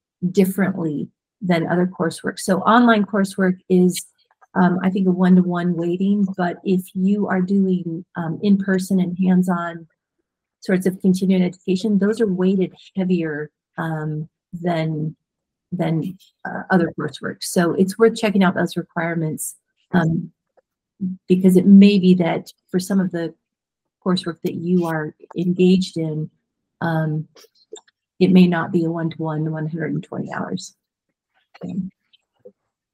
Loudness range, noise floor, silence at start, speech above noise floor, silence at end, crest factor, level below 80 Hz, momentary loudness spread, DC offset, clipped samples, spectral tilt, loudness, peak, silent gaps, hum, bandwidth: 8 LU; -83 dBFS; 0.2 s; 64 dB; 1.05 s; 18 dB; -64 dBFS; 14 LU; under 0.1%; under 0.1%; -7 dB/octave; -19 LUFS; 0 dBFS; none; none; 15.5 kHz